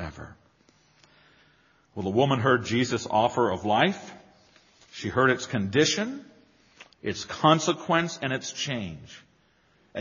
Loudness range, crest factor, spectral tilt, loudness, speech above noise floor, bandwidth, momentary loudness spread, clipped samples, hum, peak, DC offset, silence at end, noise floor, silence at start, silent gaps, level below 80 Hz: 3 LU; 22 dB; -3.5 dB/octave; -25 LUFS; 39 dB; 7.4 kHz; 18 LU; under 0.1%; none; -6 dBFS; under 0.1%; 0 s; -64 dBFS; 0 s; none; -60 dBFS